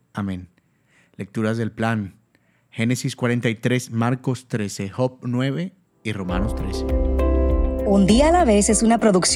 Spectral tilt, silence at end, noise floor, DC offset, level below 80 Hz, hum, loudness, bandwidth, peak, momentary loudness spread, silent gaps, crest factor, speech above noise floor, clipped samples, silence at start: -5 dB/octave; 0 s; -62 dBFS; under 0.1%; -28 dBFS; none; -21 LUFS; 14 kHz; -4 dBFS; 14 LU; none; 18 dB; 42 dB; under 0.1%; 0.15 s